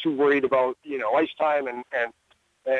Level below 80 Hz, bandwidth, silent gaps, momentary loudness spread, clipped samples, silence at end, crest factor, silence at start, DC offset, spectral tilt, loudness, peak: -70 dBFS; 6.6 kHz; none; 8 LU; under 0.1%; 0 s; 14 dB; 0 s; under 0.1%; -6.5 dB/octave; -24 LUFS; -10 dBFS